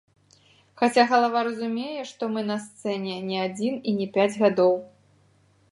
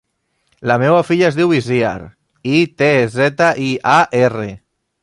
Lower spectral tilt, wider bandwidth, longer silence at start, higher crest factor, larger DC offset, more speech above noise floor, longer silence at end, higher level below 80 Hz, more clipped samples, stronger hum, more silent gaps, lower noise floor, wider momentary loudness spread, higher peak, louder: about the same, -5.5 dB/octave vs -6 dB/octave; about the same, 11.5 kHz vs 11.5 kHz; first, 0.75 s vs 0.6 s; first, 20 dB vs 14 dB; neither; second, 37 dB vs 51 dB; first, 0.85 s vs 0.45 s; second, -74 dBFS vs -52 dBFS; neither; neither; neither; second, -61 dBFS vs -65 dBFS; about the same, 11 LU vs 12 LU; second, -6 dBFS vs 0 dBFS; second, -24 LUFS vs -14 LUFS